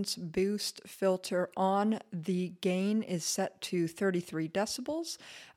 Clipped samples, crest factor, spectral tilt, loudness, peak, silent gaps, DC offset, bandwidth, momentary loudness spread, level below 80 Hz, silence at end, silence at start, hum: under 0.1%; 16 dB; -4.5 dB/octave; -33 LUFS; -18 dBFS; none; under 0.1%; 16 kHz; 6 LU; -70 dBFS; 0.05 s; 0 s; none